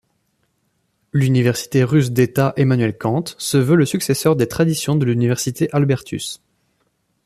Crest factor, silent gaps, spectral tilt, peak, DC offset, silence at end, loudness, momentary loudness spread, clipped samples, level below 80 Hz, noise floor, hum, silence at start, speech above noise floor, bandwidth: 16 dB; none; -6 dB/octave; -2 dBFS; under 0.1%; 0.9 s; -18 LUFS; 6 LU; under 0.1%; -52 dBFS; -67 dBFS; none; 1.15 s; 50 dB; 14.5 kHz